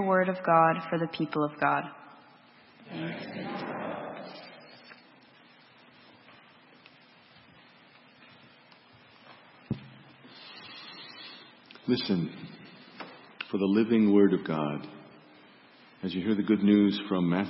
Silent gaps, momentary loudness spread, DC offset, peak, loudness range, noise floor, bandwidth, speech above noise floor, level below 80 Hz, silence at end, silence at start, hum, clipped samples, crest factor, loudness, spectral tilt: none; 25 LU; under 0.1%; -8 dBFS; 19 LU; -57 dBFS; 5.8 kHz; 31 dB; -72 dBFS; 0 s; 0 s; none; under 0.1%; 22 dB; -28 LUFS; -10.5 dB/octave